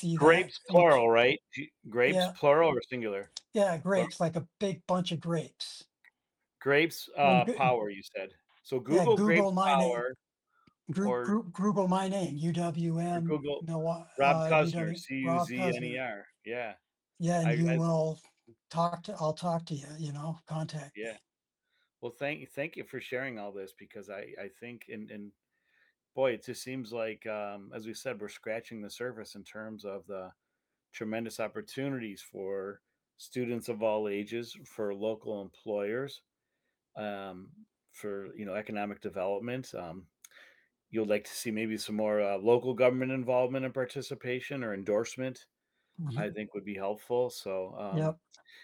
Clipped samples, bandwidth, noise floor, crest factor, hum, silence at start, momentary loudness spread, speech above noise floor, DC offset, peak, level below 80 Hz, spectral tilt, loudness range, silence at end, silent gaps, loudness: under 0.1%; 18 kHz; -86 dBFS; 22 dB; none; 0 s; 18 LU; 55 dB; under 0.1%; -10 dBFS; -74 dBFS; -6 dB/octave; 11 LU; 0.05 s; none; -31 LUFS